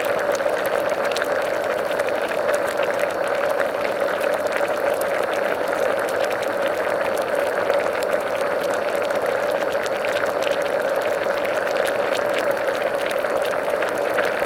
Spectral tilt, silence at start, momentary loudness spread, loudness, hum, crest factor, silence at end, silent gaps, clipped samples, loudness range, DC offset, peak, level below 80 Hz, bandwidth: -3 dB/octave; 0 s; 1 LU; -22 LUFS; none; 18 dB; 0 s; none; under 0.1%; 0 LU; under 0.1%; -4 dBFS; -60 dBFS; 17 kHz